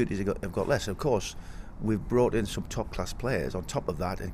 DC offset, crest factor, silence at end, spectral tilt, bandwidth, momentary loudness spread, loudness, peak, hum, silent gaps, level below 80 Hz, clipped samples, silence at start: under 0.1%; 16 dB; 0 s; -5.5 dB/octave; 16 kHz; 9 LU; -30 LUFS; -12 dBFS; none; none; -42 dBFS; under 0.1%; 0 s